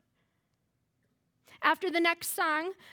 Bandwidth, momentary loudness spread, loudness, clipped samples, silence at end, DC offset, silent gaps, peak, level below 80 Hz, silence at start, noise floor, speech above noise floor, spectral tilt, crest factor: over 20 kHz; 3 LU; -29 LUFS; under 0.1%; 0.2 s; under 0.1%; none; -12 dBFS; -84 dBFS; 1.6 s; -78 dBFS; 48 dB; -1 dB/octave; 22 dB